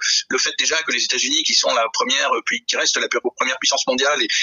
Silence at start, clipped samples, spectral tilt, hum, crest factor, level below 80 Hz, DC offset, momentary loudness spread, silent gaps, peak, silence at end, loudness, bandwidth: 0 s; under 0.1%; 1 dB/octave; none; 16 dB; -72 dBFS; under 0.1%; 5 LU; none; -2 dBFS; 0 s; -18 LUFS; 10.5 kHz